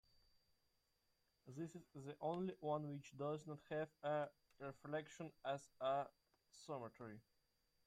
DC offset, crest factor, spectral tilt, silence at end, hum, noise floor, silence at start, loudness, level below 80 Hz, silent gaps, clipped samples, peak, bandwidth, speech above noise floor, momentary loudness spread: under 0.1%; 18 dB; -6.5 dB/octave; 0.65 s; none; -84 dBFS; 1.45 s; -49 LUFS; -84 dBFS; none; under 0.1%; -32 dBFS; 15 kHz; 36 dB; 12 LU